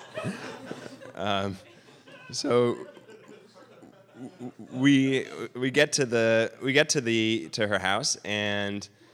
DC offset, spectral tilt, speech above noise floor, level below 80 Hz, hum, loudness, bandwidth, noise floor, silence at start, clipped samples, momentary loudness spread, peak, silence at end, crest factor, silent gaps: under 0.1%; -4 dB/octave; 26 dB; -72 dBFS; none; -26 LUFS; 14.5 kHz; -53 dBFS; 0 s; under 0.1%; 19 LU; -8 dBFS; 0.3 s; 20 dB; none